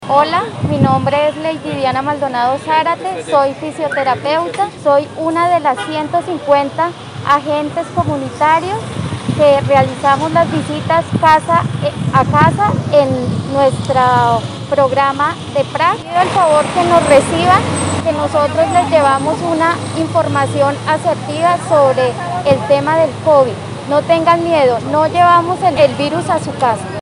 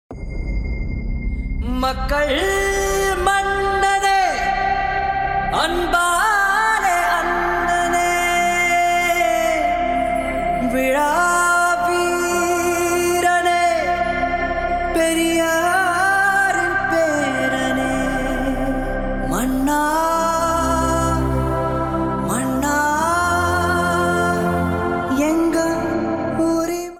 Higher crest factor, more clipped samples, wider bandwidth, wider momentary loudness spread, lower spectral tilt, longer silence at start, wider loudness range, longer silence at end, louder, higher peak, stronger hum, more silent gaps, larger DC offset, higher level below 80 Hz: about the same, 14 dB vs 14 dB; first, 0.1% vs under 0.1%; second, 11.5 kHz vs 17 kHz; about the same, 7 LU vs 6 LU; first, -5.5 dB/octave vs -4 dB/octave; about the same, 0 s vs 0.1 s; about the same, 3 LU vs 3 LU; about the same, 0 s vs 0 s; first, -13 LUFS vs -18 LUFS; first, 0 dBFS vs -6 dBFS; neither; neither; neither; second, -50 dBFS vs -32 dBFS